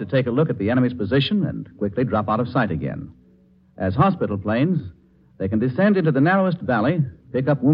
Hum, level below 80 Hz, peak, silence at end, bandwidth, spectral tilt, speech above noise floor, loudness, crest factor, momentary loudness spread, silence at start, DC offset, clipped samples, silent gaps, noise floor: none; -52 dBFS; -4 dBFS; 0 s; 5.4 kHz; -10.5 dB/octave; 34 dB; -21 LUFS; 18 dB; 10 LU; 0 s; under 0.1%; under 0.1%; none; -54 dBFS